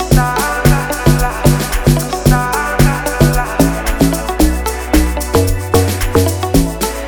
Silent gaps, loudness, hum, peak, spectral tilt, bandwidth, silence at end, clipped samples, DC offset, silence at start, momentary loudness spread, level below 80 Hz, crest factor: none; -14 LUFS; none; 0 dBFS; -5.5 dB/octave; over 20 kHz; 0 s; 0.2%; 0.1%; 0 s; 2 LU; -20 dBFS; 12 dB